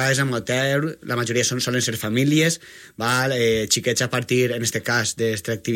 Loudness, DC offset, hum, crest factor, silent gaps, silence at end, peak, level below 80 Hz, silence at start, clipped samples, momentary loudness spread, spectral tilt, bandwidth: -21 LUFS; under 0.1%; none; 16 dB; none; 0 s; -6 dBFS; -56 dBFS; 0 s; under 0.1%; 6 LU; -4 dB/octave; 16.5 kHz